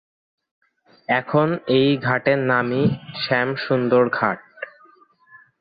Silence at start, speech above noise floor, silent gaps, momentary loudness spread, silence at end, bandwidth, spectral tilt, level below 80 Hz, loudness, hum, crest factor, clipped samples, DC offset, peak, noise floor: 1.1 s; 34 dB; none; 14 LU; 0.9 s; 5 kHz; -9.5 dB/octave; -60 dBFS; -20 LUFS; none; 18 dB; under 0.1%; under 0.1%; -4 dBFS; -54 dBFS